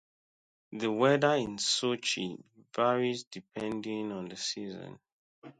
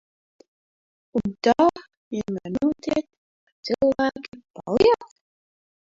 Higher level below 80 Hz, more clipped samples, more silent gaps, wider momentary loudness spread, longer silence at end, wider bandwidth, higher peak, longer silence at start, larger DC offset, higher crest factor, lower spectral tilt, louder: second, -72 dBFS vs -54 dBFS; neither; second, 3.27-3.31 s, 5.12-5.42 s vs 1.97-2.11 s, 3.18-3.63 s, 4.50-4.54 s; about the same, 17 LU vs 16 LU; second, 0.1 s vs 0.9 s; first, 9.6 kHz vs 7.8 kHz; second, -12 dBFS vs -6 dBFS; second, 0.7 s vs 1.15 s; neither; about the same, 20 dB vs 20 dB; second, -3.5 dB/octave vs -6 dB/octave; second, -31 LUFS vs -23 LUFS